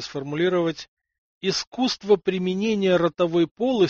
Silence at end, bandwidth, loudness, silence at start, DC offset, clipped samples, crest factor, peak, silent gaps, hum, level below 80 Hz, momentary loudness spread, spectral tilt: 0 s; 7.6 kHz; -23 LUFS; 0 s; under 0.1%; under 0.1%; 16 dB; -6 dBFS; 0.88-0.97 s, 1.18-1.41 s, 1.67-1.72 s, 3.51-3.56 s; none; -60 dBFS; 7 LU; -4.5 dB/octave